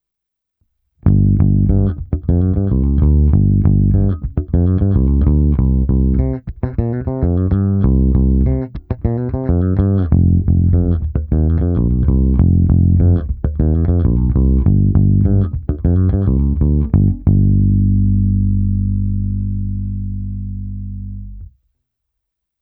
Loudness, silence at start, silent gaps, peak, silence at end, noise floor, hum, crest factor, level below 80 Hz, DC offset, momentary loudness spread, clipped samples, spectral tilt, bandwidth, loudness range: -15 LUFS; 1.05 s; none; 0 dBFS; 1.15 s; -80 dBFS; none; 14 dB; -20 dBFS; under 0.1%; 9 LU; under 0.1%; -15 dB/octave; 2.2 kHz; 4 LU